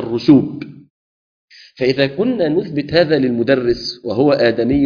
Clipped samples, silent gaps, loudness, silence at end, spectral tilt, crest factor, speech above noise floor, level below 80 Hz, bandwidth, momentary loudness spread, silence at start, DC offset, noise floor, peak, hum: under 0.1%; 0.90-1.48 s; -16 LUFS; 0 s; -7.5 dB/octave; 16 dB; over 75 dB; -44 dBFS; 5.2 kHz; 9 LU; 0 s; under 0.1%; under -90 dBFS; 0 dBFS; none